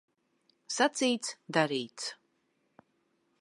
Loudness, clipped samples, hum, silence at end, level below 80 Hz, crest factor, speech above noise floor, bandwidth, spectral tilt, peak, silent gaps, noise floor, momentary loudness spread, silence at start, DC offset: -31 LUFS; under 0.1%; none; 1.25 s; -88 dBFS; 24 dB; 45 dB; 11.5 kHz; -3 dB/octave; -10 dBFS; none; -76 dBFS; 12 LU; 0.7 s; under 0.1%